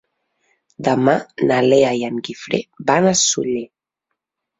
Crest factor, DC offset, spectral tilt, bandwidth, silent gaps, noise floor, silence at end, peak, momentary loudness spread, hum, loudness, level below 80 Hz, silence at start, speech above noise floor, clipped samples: 18 dB; under 0.1%; -4 dB/octave; 8 kHz; none; -79 dBFS; 0.95 s; -2 dBFS; 11 LU; none; -17 LUFS; -60 dBFS; 0.8 s; 62 dB; under 0.1%